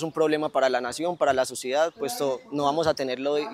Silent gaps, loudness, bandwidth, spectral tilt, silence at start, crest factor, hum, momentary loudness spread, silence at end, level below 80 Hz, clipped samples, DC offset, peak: none; -25 LUFS; 16 kHz; -4 dB/octave; 0 s; 18 dB; none; 5 LU; 0 s; -62 dBFS; under 0.1%; under 0.1%; -8 dBFS